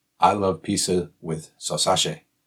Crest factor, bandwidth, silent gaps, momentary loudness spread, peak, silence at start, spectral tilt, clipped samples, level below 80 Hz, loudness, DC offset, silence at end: 20 dB; 17.5 kHz; none; 11 LU; -4 dBFS; 0.2 s; -3.5 dB/octave; under 0.1%; -60 dBFS; -23 LUFS; under 0.1%; 0.3 s